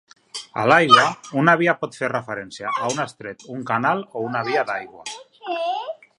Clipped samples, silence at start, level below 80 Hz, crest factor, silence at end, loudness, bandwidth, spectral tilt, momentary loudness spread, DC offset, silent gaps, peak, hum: under 0.1%; 0.35 s; -66 dBFS; 22 dB; 0.25 s; -20 LUFS; 11.5 kHz; -4.5 dB/octave; 20 LU; under 0.1%; none; 0 dBFS; none